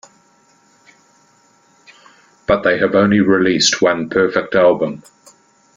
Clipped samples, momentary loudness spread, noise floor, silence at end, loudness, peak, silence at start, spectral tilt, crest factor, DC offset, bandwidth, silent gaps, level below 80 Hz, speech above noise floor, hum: under 0.1%; 8 LU; -54 dBFS; 0.8 s; -14 LUFS; 0 dBFS; 2.5 s; -4 dB/octave; 18 dB; under 0.1%; 9.4 kHz; none; -50 dBFS; 40 dB; none